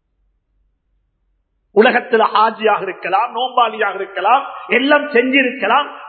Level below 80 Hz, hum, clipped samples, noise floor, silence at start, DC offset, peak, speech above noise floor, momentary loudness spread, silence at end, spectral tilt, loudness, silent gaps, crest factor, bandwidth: -68 dBFS; none; under 0.1%; -65 dBFS; 1.75 s; under 0.1%; 0 dBFS; 50 dB; 6 LU; 0 s; -8 dB/octave; -15 LUFS; none; 16 dB; 4.5 kHz